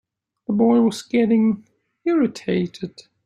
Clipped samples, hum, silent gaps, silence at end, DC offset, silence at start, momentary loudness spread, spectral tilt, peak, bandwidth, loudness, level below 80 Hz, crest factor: under 0.1%; none; none; 0.35 s; under 0.1%; 0.5 s; 15 LU; -7 dB/octave; -6 dBFS; 10.5 kHz; -20 LUFS; -62 dBFS; 16 dB